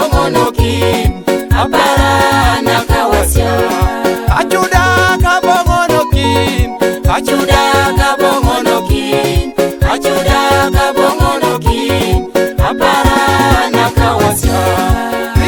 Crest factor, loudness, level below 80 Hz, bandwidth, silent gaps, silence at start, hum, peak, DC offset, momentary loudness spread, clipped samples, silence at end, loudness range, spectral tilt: 10 dB; -11 LUFS; -20 dBFS; over 20 kHz; none; 0 s; none; 0 dBFS; under 0.1%; 4 LU; 0.2%; 0 s; 1 LU; -5 dB/octave